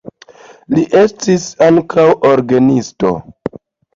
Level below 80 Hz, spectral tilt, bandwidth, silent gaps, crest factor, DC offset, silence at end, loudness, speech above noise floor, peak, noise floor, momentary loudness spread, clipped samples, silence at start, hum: -48 dBFS; -6 dB/octave; 7.6 kHz; none; 12 dB; under 0.1%; 0.5 s; -12 LUFS; 29 dB; 0 dBFS; -40 dBFS; 12 LU; under 0.1%; 0.05 s; none